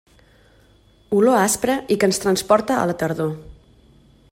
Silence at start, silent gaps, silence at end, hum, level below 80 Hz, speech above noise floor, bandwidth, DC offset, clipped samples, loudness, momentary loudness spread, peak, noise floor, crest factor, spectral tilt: 1.1 s; none; 0.8 s; none; -52 dBFS; 35 dB; 16 kHz; under 0.1%; under 0.1%; -19 LUFS; 8 LU; -4 dBFS; -54 dBFS; 18 dB; -4.5 dB/octave